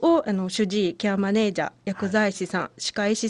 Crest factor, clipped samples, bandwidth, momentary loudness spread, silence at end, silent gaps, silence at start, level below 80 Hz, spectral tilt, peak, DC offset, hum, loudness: 14 dB; under 0.1%; 11.5 kHz; 6 LU; 0 s; none; 0 s; -62 dBFS; -5 dB/octave; -10 dBFS; under 0.1%; none; -24 LUFS